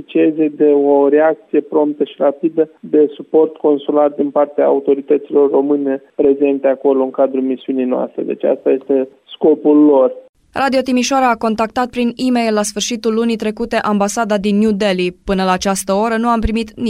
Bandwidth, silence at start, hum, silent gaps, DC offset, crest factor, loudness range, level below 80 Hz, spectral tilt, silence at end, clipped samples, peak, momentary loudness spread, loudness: 15.5 kHz; 0 s; none; 10.29-10.33 s; under 0.1%; 12 dB; 2 LU; -40 dBFS; -5 dB/octave; 0 s; under 0.1%; -2 dBFS; 7 LU; -15 LUFS